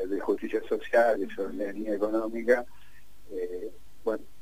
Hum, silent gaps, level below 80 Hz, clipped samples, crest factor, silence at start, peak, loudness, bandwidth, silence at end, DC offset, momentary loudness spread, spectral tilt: none; none; -60 dBFS; under 0.1%; 20 dB; 0 s; -10 dBFS; -29 LUFS; 15.5 kHz; 0.2 s; 1%; 14 LU; -5.5 dB/octave